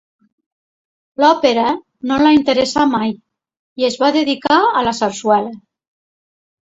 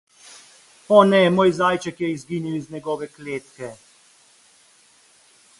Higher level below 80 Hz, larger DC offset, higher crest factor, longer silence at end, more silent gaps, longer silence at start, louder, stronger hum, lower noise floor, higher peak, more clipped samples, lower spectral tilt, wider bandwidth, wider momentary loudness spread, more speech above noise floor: first, -54 dBFS vs -62 dBFS; neither; second, 16 dB vs 22 dB; second, 1.2 s vs 1.85 s; first, 3.59-3.76 s vs none; first, 1.2 s vs 0.9 s; first, -15 LUFS vs -20 LUFS; neither; first, under -90 dBFS vs -55 dBFS; about the same, 0 dBFS vs 0 dBFS; neither; second, -4 dB/octave vs -6 dB/octave; second, 8 kHz vs 11.5 kHz; second, 10 LU vs 17 LU; first, over 76 dB vs 36 dB